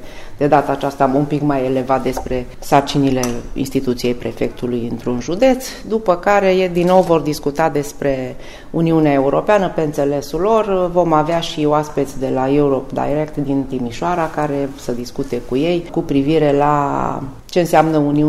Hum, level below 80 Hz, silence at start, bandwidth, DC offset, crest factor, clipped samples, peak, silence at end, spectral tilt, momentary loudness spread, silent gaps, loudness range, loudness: none; -36 dBFS; 0 s; 15.5 kHz; under 0.1%; 16 dB; under 0.1%; 0 dBFS; 0 s; -6.5 dB/octave; 9 LU; none; 3 LU; -17 LUFS